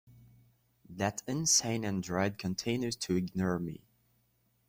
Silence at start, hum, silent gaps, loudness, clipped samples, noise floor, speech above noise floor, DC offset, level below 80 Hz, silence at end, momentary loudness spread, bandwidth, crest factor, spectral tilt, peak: 0.9 s; none; none; -32 LUFS; under 0.1%; -73 dBFS; 41 dB; under 0.1%; -64 dBFS; 0.9 s; 11 LU; 16 kHz; 20 dB; -3.5 dB/octave; -14 dBFS